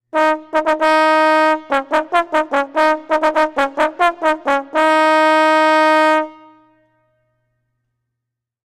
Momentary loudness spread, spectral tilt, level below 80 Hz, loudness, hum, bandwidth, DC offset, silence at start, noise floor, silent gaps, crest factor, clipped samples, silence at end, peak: 6 LU; -2 dB/octave; -56 dBFS; -15 LUFS; none; 14 kHz; under 0.1%; 0.15 s; -81 dBFS; none; 14 dB; under 0.1%; 2.3 s; -2 dBFS